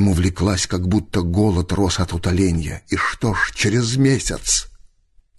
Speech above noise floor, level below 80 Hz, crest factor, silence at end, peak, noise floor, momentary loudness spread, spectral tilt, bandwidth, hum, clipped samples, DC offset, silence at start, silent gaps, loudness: 36 dB; -30 dBFS; 14 dB; 0.7 s; -4 dBFS; -55 dBFS; 4 LU; -4.5 dB/octave; 12.5 kHz; none; under 0.1%; under 0.1%; 0 s; none; -19 LUFS